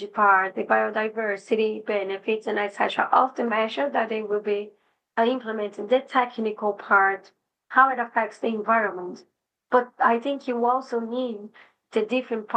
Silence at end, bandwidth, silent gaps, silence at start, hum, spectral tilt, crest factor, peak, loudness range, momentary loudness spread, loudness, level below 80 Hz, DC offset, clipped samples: 0 s; 9 kHz; none; 0 s; none; -5 dB/octave; 20 dB; -4 dBFS; 3 LU; 10 LU; -24 LUFS; -86 dBFS; under 0.1%; under 0.1%